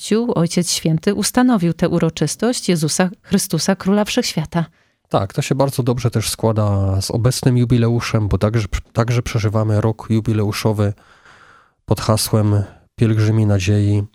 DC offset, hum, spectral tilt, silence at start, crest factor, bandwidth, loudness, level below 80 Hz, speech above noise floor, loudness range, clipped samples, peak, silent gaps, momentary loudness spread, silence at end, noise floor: under 0.1%; none; -5.5 dB/octave; 0 s; 16 dB; 16 kHz; -18 LUFS; -38 dBFS; 33 dB; 2 LU; under 0.1%; 0 dBFS; none; 5 LU; 0.05 s; -49 dBFS